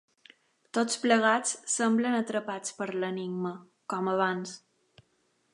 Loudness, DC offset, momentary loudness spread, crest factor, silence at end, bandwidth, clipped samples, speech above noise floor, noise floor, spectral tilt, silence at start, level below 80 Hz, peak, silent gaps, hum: -29 LUFS; under 0.1%; 13 LU; 22 dB; 0.95 s; 11.5 kHz; under 0.1%; 43 dB; -72 dBFS; -3.5 dB/octave; 0.75 s; -82 dBFS; -10 dBFS; none; none